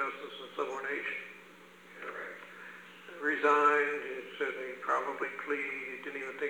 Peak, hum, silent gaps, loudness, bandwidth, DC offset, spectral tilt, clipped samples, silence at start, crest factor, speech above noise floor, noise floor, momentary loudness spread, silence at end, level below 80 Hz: -14 dBFS; 60 Hz at -80 dBFS; none; -33 LUFS; 20 kHz; under 0.1%; -3.5 dB/octave; under 0.1%; 0 s; 20 dB; 22 dB; -55 dBFS; 21 LU; 0 s; under -90 dBFS